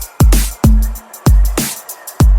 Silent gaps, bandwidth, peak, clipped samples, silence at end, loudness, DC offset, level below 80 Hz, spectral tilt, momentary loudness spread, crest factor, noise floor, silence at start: none; 17.5 kHz; 0 dBFS; under 0.1%; 0 s; -14 LUFS; under 0.1%; -12 dBFS; -5.5 dB/octave; 10 LU; 12 dB; -29 dBFS; 0 s